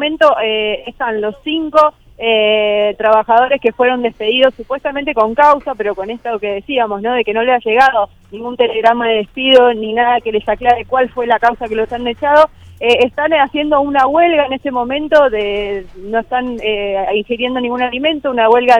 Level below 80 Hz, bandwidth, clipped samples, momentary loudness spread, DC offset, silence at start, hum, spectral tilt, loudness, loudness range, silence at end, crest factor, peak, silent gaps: -44 dBFS; 9.8 kHz; 0.1%; 9 LU; under 0.1%; 0 s; none; -5 dB/octave; -14 LUFS; 3 LU; 0 s; 14 dB; 0 dBFS; none